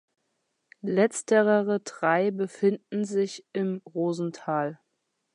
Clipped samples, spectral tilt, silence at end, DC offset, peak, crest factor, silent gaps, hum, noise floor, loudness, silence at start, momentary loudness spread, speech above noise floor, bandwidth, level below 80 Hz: under 0.1%; -5.5 dB/octave; 0.6 s; under 0.1%; -8 dBFS; 18 dB; none; none; -78 dBFS; -27 LUFS; 0.85 s; 8 LU; 52 dB; 11 kHz; -82 dBFS